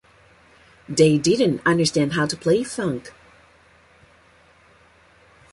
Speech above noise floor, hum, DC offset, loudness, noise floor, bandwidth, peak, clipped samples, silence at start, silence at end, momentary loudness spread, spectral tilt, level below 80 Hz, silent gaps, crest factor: 35 dB; none; under 0.1%; -20 LUFS; -54 dBFS; 11.5 kHz; -4 dBFS; under 0.1%; 0.9 s; 2.45 s; 10 LU; -5 dB/octave; -56 dBFS; none; 20 dB